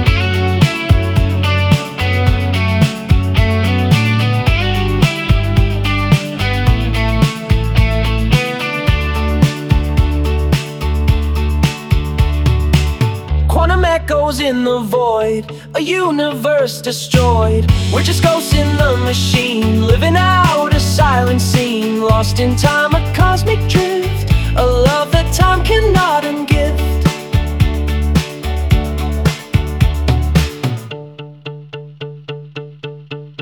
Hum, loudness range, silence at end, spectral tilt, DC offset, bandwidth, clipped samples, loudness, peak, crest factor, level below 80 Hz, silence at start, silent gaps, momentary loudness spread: none; 4 LU; 0 s; -6 dB/octave; under 0.1%; 20 kHz; under 0.1%; -14 LUFS; 0 dBFS; 14 dB; -20 dBFS; 0 s; none; 7 LU